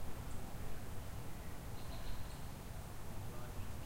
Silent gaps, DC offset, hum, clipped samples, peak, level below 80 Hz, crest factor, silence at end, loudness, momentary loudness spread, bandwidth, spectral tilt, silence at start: none; under 0.1%; none; under 0.1%; -30 dBFS; -50 dBFS; 12 dB; 0 s; -50 LUFS; 1 LU; 16 kHz; -5 dB/octave; 0 s